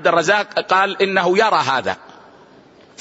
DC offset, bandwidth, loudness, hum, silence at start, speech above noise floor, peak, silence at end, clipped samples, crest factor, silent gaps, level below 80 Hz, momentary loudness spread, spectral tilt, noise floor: under 0.1%; 8 kHz; -16 LUFS; none; 0 s; 30 dB; -2 dBFS; 1.05 s; under 0.1%; 16 dB; none; -62 dBFS; 7 LU; -3.5 dB/octave; -47 dBFS